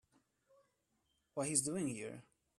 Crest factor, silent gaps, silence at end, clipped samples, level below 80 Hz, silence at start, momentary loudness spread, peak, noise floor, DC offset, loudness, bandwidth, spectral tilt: 26 dB; none; 0.4 s; under 0.1%; -78 dBFS; 1.35 s; 15 LU; -18 dBFS; -82 dBFS; under 0.1%; -38 LUFS; 14 kHz; -3.5 dB/octave